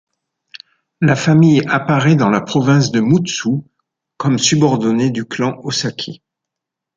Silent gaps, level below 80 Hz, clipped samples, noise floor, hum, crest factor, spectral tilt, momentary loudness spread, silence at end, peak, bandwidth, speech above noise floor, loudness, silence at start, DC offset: none; -54 dBFS; under 0.1%; -82 dBFS; none; 14 dB; -5.5 dB/octave; 9 LU; 0.85 s; 0 dBFS; 9.2 kHz; 69 dB; -15 LUFS; 1 s; under 0.1%